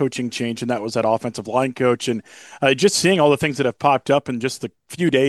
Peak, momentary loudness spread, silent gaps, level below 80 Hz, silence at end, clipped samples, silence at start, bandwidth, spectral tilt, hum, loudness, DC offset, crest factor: -2 dBFS; 9 LU; none; -60 dBFS; 0 s; under 0.1%; 0 s; 12.5 kHz; -4.5 dB/octave; none; -20 LUFS; under 0.1%; 18 dB